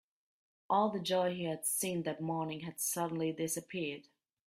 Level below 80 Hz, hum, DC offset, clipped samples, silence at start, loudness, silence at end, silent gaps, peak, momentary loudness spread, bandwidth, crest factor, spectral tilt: -78 dBFS; none; under 0.1%; under 0.1%; 0.7 s; -35 LUFS; 0.45 s; none; -18 dBFS; 8 LU; 16 kHz; 18 dB; -4 dB/octave